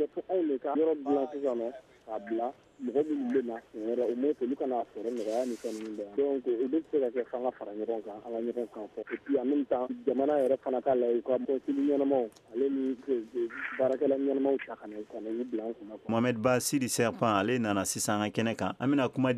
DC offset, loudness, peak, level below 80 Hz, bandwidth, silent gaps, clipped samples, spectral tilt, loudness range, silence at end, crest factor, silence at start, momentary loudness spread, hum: under 0.1%; -31 LUFS; -12 dBFS; -72 dBFS; 15 kHz; none; under 0.1%; -5 dB/octave; 4 LU; 0 s; 18 dB; 0 s; 10 LU; none